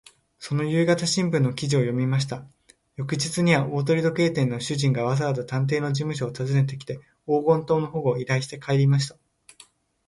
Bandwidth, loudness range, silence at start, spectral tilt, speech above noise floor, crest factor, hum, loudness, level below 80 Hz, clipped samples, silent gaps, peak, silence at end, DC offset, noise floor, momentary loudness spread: 11.5 kHz; 1 LU; 0.4 s; -6 dB/octave; 32 dB; 18 dB; none; -24 LUFS; -60 dBFS; under 0.1%; none; -6 dBFS; 1 s; under 0.1%; -55 dBFS; 9 LU